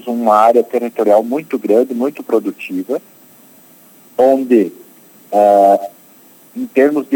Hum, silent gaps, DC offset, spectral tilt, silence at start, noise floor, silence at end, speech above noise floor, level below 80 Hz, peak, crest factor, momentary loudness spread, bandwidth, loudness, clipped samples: none; none; under 0.1%; -6.5 dB/octave; 0.05 s; -44 dBFS; 0 s; 31 dB; -70 dBFS; 0 dBFS; 14 dB; 13 LU; 20 kHz; -14 LUFS; under 0.1%